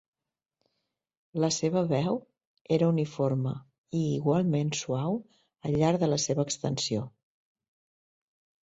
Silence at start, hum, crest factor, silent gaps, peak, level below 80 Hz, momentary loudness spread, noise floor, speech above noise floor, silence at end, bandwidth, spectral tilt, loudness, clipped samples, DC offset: 1.35 s; none; 18 dB; 2.47-2.55 s, 2.61-2.65 s, 3.78-3.84 s; -12 dBFS; -64 dBFS; 9 LU; under -90 dBFS; over 62 dB; 1.55 s; 8.2 kHz; -5.5 dB/octave; -29 LUFS; under 0.1%; under 0.1%